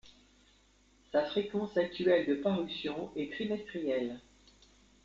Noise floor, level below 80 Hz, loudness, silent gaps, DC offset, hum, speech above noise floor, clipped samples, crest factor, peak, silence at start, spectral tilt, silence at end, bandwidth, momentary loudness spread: -66 dBFS; -66 dBFS; -34 LUFS; none; under 0.1%; none; 33 dB; under 0.1%; 18 dB; -16 dBFS; 0.05 s; -6.5 dB/octave; 0.85 s; 7.6 kHz; 9 LU